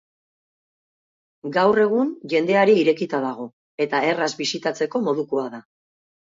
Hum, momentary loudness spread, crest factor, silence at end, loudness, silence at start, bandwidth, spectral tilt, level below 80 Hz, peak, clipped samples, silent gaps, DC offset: none; 15 LU; 18 dB; 0.8 s; -21 LUFS; 1.45 s; 7.6 kHz; -5 dB/octave; -70 dBFS; -4 dBFS; under 0.1%; 3.53-3.78 s; under 0.1%